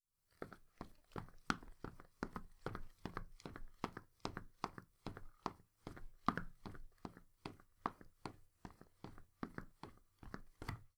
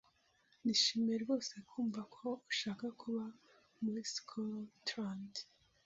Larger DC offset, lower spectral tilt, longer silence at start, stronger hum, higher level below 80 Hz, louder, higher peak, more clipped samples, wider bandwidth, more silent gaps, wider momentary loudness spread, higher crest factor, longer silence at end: neither; first, -5.5 dB/octave vs -3 dB/octave; second, 0.4 s vs 0.65 s; neither; first, -60 dBFS vs -82 dBFS; second, -51 LUFS vs -40 LUFS; first, -14 dBFS vs -20 dBFS; neither; first, over 20 kHz vs 7.6 kHz; neither; about the same, 15 LU vs 13 LU; first, 36 dB vs 22 dB; second, 0.1 s vs 0.45 s